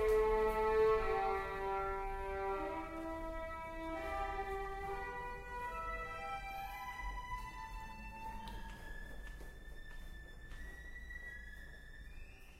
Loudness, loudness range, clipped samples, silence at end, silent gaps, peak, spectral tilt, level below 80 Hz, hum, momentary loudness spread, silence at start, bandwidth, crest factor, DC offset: -41 LUFS; 14 LU; under 0.1%; 0 s; none; -22 dBFS; -5.5 dB/octave; -50 dBFS; none; 20 LU; 0 s; 16 kHz; 18 dB; under 0.1%